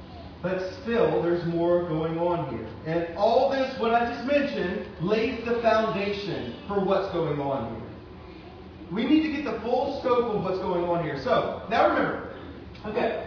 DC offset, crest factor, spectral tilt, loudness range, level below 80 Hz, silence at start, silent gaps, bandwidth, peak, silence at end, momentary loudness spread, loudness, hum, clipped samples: under 0.1%; 18 dB; -7.5 dB/octave; 3 LU; -52 dBFS; 0 s; none; 5.4 kHz; -8 dBFS; 0 s; 16 LU; -26 LUFS; none; under 0.1%